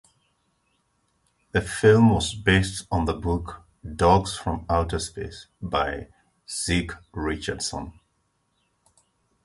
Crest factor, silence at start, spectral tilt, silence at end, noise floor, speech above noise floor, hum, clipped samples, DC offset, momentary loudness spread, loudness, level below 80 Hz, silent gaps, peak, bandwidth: 22 dB; 1.55 s; -5 dB/octave; 1.55 s; -71 dBFS; 48 dB; none; under 0.1%; under 0.1%; 18 LU; -24 LUFS; -38 dBFS; none; -4 dBFS; 11.5 kHz